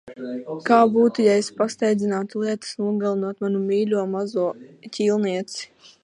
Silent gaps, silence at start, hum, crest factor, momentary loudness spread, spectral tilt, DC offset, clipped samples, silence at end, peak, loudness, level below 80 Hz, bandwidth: none; 0.05 s; none; 18 dB; 15 LU; -5.5 dB/octave; under 0.1%; under 0.1%; 0.4 s; -2 dBFS; -22 LUFS; -72 dBFS; 11 kHz